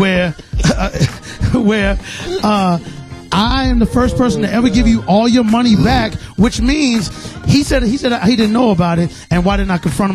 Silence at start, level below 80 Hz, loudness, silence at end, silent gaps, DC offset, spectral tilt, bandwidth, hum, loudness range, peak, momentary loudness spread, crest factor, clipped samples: 0 s; -24 dBFS; -14 LUFS; 0 s; none; under 0.1%; -6 dB/octave; 14 kHz; none; 3 LU; 0 dBFS; 7 LU; 12 dB; under 0.1%